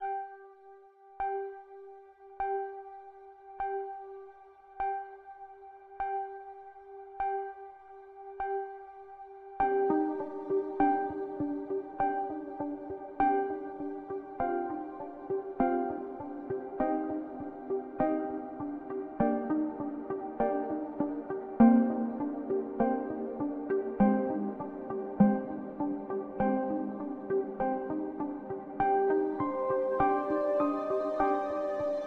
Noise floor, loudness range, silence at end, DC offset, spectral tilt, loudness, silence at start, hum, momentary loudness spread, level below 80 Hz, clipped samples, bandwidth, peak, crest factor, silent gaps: -55 dBFS; 11 LU; 0 s; under 0.1%; -10 dB/octave; -32 LUFS; 0 s; none; 20 LU; -62 dBFS; under 0.1%; 4.4 kHz; -10 dBFS; 22 dB; none